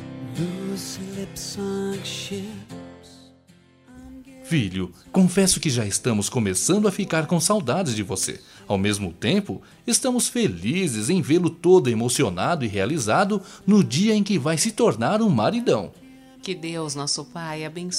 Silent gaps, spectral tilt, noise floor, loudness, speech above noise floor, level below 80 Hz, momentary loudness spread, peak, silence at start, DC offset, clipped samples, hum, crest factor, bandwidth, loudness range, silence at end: none; -4.5 dB/octave; -54 dBFS; -22 LUFS; 32 dB; -54 dBFS; 13 LU; -4 dBFS; 0 s; under 0.1%; under 0.1%; none; 18 dB; 16 kHz; 10 LU; 0 s